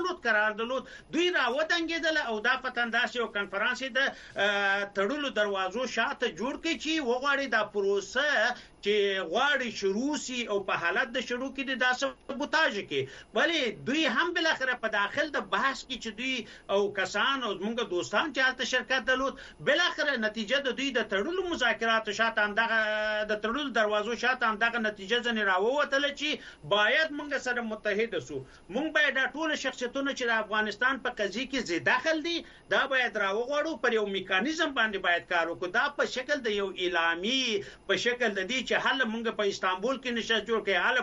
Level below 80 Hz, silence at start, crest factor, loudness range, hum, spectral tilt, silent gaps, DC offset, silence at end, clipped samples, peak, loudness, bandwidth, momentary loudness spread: -62 dBFS; 0 s; 18 dB; 2 LU; none; -3 dB/octave; none; under 0.1%; 0 s; under 0.1%; -12 dBFS; -28 LUFS; 10.5 kHz; 6 LU